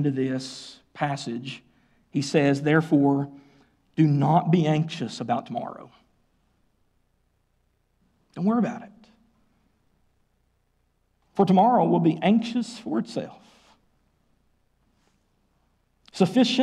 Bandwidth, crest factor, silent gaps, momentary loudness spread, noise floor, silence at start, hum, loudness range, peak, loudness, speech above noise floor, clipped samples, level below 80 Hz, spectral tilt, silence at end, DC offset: 11 kHz; 18 dB; none; 19 LU; -69 dBFS; 0 s; none; 12 LU; -8 dBFS; -24 LUFS; 47 dB; under 0.1%; -68 dBFS; -7 dB/octave; 0 s; under 0.1%